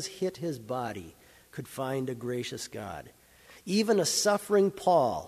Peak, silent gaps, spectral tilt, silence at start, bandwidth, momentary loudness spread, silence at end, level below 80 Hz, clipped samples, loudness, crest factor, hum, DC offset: -12 dBFS; none; -4 dB/octave; 0 s; 15.5 kHz; 18 LU; 0 s; -64 dBFS; under 0.1%; -29 LUFS; 18 dB; none; under 0.1%